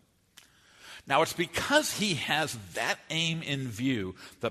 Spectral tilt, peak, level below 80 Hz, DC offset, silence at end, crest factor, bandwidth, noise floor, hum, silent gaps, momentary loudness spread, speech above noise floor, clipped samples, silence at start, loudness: -3.5 dB/octave; -10 dBFS; -62 dBFS; under 0.1%; 0 s; 22 dB; 13.5 kHz; -60 dBFS; none; none; 9 LU; 30 dB; under 0.1%; 0.8 s; -29 LUFS